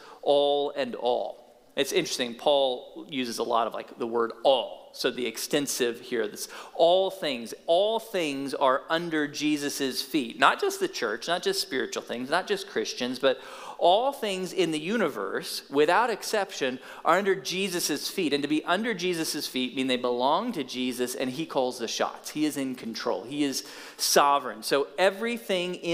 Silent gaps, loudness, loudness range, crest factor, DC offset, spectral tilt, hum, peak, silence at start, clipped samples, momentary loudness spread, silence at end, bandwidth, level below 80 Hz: none; -27 LUFS; 2 LU; 24 dB; under 0.1%; -3 dB/octave; none; -4 dBFS; 0 s; under 0.1%; 9 LU; 0 s; 16 kHz; -74 dBFS